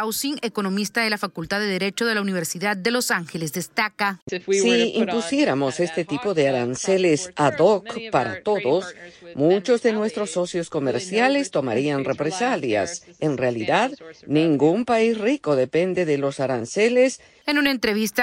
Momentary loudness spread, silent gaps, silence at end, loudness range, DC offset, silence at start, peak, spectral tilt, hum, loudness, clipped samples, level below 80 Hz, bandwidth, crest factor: 7 LU; 4.22-4.27 s; 0 s; 2 LU; under 0.1%; 0 s; -6 dBFS; -4.5 dB/octave; none; -22 LUFS; under 0.1%; -62 dBFS; 16 kHz; 16 dB